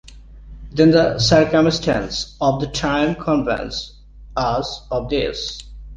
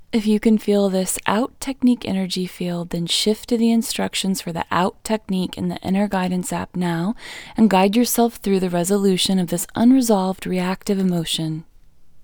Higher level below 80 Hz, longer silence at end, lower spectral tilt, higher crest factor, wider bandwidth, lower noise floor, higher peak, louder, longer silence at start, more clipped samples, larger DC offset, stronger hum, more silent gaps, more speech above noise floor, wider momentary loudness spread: first, -38 dBFS vs -48 dBFS; about the same, 0 s vs 0 s; about the same, -5.5 dB/octave vs -5 dB/octave; about the same, 18 dB vs 20 dB; second, 9.6 kHz vs over 20 kHz; second, -39 dBFS vs -44 dBFS; about the same, -2 dBFS vs 0 dBFS; about the same, -19 LUFS vs -20 LUFS; about the same, 0.05 s vs 0 s; neither; neither; neither; neither; about the same, 21 dB vs 24 dB; first, 15 LU vs 9 LU